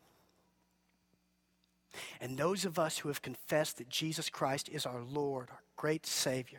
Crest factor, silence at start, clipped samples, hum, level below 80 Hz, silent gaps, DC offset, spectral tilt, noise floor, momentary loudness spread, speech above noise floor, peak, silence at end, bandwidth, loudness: 20 dB; 1.95 s; under 0.1%; none; -76 dBFS; none; under 0.1%; -3.5 dB/octave; -76 dBFS; 10 LU; 39 dB; -18 dBFS; 0 s; 19.5 kHz; -37 LUFS